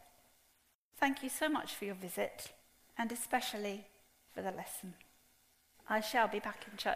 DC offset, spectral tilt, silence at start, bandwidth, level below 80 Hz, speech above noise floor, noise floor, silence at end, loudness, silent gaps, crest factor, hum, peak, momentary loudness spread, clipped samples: under 0.1%; -3 dB/octave; 0 s; 15.5 kHz; -74 dBFS; 35 dB; -74 dBFS; 0 s; -38 LUFS; 0.75-0.91 s; 22 dB; none; -18 dBFS; 15 LU; under 0.1%